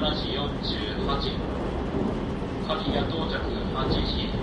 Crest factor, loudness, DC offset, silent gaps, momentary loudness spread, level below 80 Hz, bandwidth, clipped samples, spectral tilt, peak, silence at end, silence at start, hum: 16 dB; -28 LUFS; under 0.1%; none; 4 LU; -34 dBFS; 10.5 kHz; under 0.1%; -7 dB/octave; -10 dBFS; 0 s; 0 s; none